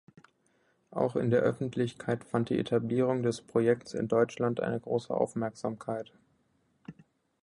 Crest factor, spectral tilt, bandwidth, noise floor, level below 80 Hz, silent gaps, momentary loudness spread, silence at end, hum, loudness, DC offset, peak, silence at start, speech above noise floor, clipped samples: 18 dB; -7 dB/octave; 11.5 kHz; -72 dBFS; -68 dBFS; none; 10 LU; 0.5 s; none; -31 LUFS; under 0.1%; -12 dBFS; 0.9 s; 42 dB; under 0.1%